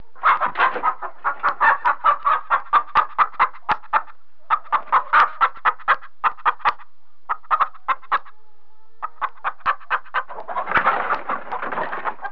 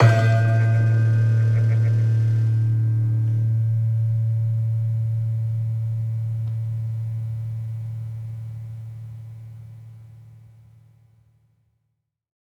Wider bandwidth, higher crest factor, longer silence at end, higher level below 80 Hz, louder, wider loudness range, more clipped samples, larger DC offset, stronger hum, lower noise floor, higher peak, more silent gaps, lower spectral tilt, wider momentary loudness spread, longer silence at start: second, 5.4 kHz vs 6.4 kHz; about the same, 16 dB vs 18 dB; second, 0 s vs 2.1 s; about the same, -58 dBFS vs -56 dBFS; about the same, -21 LUFS vs -22 LUFS; second, 6 LU vs 18 LU; neither; first, 3% vs under 0.1%; neither; second, -61 dBFS vs -75 dBFS; about the same, -4 dBFS vs -4 dBFS; neither; second, -4.5 dB/octave vs -8.5 dB/octave; second, 10 LU vs 17 LU; first, 0.2 s vs 0 s